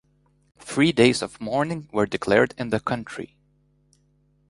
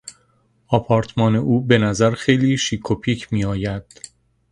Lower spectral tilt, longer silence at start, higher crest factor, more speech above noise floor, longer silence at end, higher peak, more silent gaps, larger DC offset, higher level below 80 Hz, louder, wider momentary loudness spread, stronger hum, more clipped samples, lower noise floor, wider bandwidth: about the same, -5 dB/octave vs -6 dB/octave; first, 0.65 s vs 0.05 s; about the same, 22 dB vs 20 dB; about the same, 41 dB vs 42 dB; first, 1.25 s vs 0.7 s; second, -4 dBFS vs 0 dBFS; neither; neither; second, -56 dBFS vs -44 dBFS; second, -23 LUFS vs -19 LUFS; about the same, 18 LU vs 17 LU; first, 50 Hz at -50 dBFS vs none; neither; about the same, -63 dBFS vs -61 dBFS; about the same, 11.5 kHz vs 11 kHz